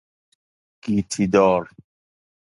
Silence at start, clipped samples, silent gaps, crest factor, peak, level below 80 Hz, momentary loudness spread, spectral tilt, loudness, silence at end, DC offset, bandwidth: 0.85 s; under 0.1%; none; 20 dB; -4 dBFS; -52 dBFS; 17 LU; -6 dB/octave; -20 LUFS; 0.8 s; under 0.1%; 11.5 kHz